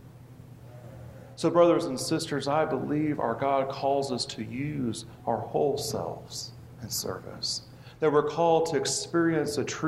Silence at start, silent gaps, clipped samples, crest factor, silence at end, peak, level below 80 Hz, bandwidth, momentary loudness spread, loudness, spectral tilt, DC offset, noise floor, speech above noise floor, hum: 0 s; none; under 0.1%; 20 dB; 0 s; -8 dBFS; -62 dBFS; 15.5 kHz; 17 LU; -28 LUFS; -4.5 dB/octave; under 0.1%; -48 dBFS; 21 dB; none